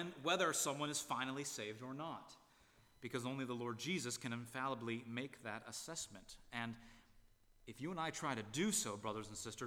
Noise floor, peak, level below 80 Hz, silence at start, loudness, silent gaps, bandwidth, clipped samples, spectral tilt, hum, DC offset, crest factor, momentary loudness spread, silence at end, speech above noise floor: -70 dBFS; -24 dBFS; -74 dBFS; 0 s; -43 LUFS; none; 19.5 kHz; under 0.1%; -3 dB/octave; none; under 0.1%; 20 dB; 12 LU; 0 s; 26 dB